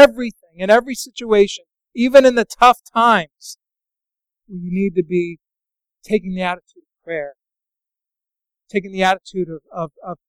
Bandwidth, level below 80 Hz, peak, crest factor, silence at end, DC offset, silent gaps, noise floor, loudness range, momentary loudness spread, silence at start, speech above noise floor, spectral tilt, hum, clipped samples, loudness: 15.5 kHz; -50 dBFS; 0 dBFS; 18 dB; 0.15 s; under 0.1%; none; -87 dBFS; 11 LU; 19 LU; 0 s; 70 dB; -5 dB/octave; none; under 0.1%; -17 LUFS